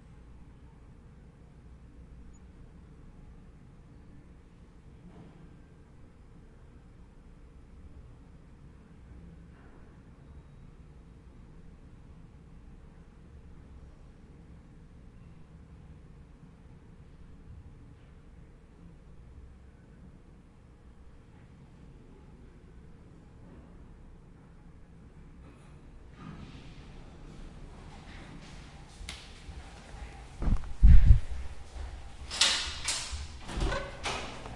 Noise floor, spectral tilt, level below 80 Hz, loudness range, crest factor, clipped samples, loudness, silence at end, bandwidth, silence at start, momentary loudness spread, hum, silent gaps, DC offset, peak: -55 dBFS; -3.5 dB/octave; -36 dBFS; 25 LU; 28 dB; under 0.1%; -31 LUFS; 0 s; 11.5 kHz; 17.5 s; 21 LU; none; none; under 0.1%; -6 dBFS